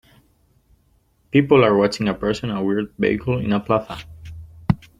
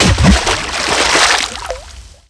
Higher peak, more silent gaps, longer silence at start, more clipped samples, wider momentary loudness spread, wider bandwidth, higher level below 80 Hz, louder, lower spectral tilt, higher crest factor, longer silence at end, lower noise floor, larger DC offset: about the same, -2 dBFS vs 0 dBFS; neither; first, 1.35 s vs 0 s; neither; first, 20 LU vs 15 LU; about the same, 11.5 kHz vs 11 kHz; second, -46 dBFS vs -22 dBFS; second, -20 LUFS vs -11 LUFS; first, -7 dB/octave vs -3 dB/octave; first, 20 dB vs 14 dB; about the same, 0.25 s vs 0.2 s; first, -61 dBFS vs -35 dBFS; neither